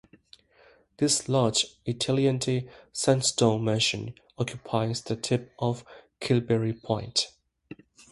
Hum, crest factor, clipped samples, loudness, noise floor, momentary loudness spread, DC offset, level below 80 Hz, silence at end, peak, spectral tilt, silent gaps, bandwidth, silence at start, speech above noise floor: none; 20 dB; under 0.1%; -27 LUFS; -59 dBFS; 10 LU; under 0.1%; -60 dBFS; 0.4 s; -8 dBFS; -4.5 dB/octave; none; 11.5 kHz; 1 s; 33 dB